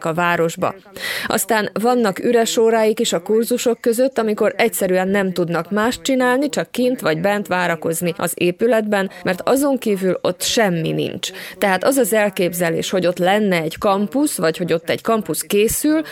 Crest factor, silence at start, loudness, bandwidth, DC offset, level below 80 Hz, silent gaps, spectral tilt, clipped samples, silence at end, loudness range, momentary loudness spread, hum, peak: 16 dB; 0 s; -18 LUFS; 19.5 kHz; under 0.1%; -54 dBFS; none; -4 dB/octave; under 0.1%; 0 s; 2 LU; 5 LU; none; -2 dBFS